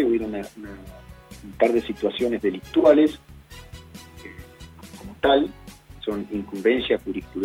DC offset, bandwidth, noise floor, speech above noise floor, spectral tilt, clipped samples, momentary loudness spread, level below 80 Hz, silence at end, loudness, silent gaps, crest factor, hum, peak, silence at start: under 0.1%; 16 kHz; -44 dBFS; 21 dB; -6 dB/octave; under 0.1%; 24 LU; -48 dBFS; 0 s; -23 LUFS; none; 20 dB; none; -4 dBFS; 0 s